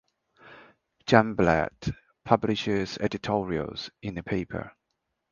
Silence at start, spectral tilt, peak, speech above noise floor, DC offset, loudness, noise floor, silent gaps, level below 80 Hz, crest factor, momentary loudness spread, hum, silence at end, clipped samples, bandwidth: 0.45 s; -6.5 dB/octave; -2 dBFS; 54 dB; under 0.1%; -27 LUFS; -80 dBFS; none; -50 dBFS; 26 dB; 15 LU; none; 0.6 s; under 0.1%; 7.2 kHz